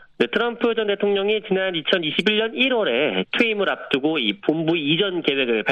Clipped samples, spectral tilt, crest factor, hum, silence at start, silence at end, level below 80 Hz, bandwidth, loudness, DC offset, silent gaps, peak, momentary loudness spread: under 0.1%; -6 dB/octave; 16 dB; none; 0.2 s; 0 s; -64 dBFS; 9 kHz; -20 LUFS; under 0.1%; none; -4 dBFS; 3 LU